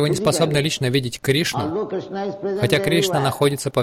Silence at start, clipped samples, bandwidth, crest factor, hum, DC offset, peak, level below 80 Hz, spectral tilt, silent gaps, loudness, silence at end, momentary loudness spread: 0 s; under 0.1%; 16.5 kHz; 16 dB; none; under 0.1%; -4 dBFS; -50 dBFS; -5 dB/octave; none; -20 LUFS; 0 s; 8 LU